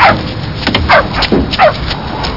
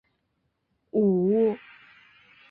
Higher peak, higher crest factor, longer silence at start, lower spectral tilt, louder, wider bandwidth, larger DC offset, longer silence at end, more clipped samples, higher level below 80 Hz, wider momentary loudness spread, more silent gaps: first, 0 dBFS vs -14 dBFS; about the same, 12 dB vs 14 dB; second, 0 s vs 0.95 s; second, -6 dB/octave vs -12 dB/octave; first, -11 LUFS vs -24 LUFS; first, 6 kHz vs 4.3 kHz; first, 1% vs under 0.1%; second, 0 s vs 0.95 s; neither; first, -24 dBFS vs -70 dBFS; about the same, 9 LU vs 9 LU; neither